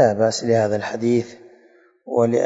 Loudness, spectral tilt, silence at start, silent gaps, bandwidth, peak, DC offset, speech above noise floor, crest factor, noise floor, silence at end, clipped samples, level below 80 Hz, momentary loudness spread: -20 LUFS; -5.5 dB/octave; 0 s; none; 8 kHz; -4 dBFS; under 0.1%; 35 dB; 16 dB; -54 dBFS; 0 s; under 0.1%; -64 dBFS; 6 LU